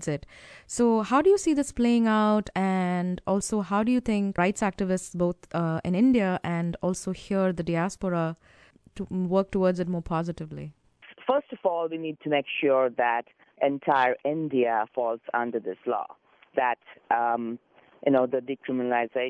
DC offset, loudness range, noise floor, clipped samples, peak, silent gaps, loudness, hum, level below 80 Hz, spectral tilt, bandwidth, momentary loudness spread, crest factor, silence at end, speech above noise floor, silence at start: under 0.1%; 5 LU; -50 dBFS; under 0.1%; -10 dBFS; none; -26 LUFS; none; -54 dBFS; -6 dB/octave; 11 kHz; 11 LU; 16 dB; 0 s; 25 dB; 0 s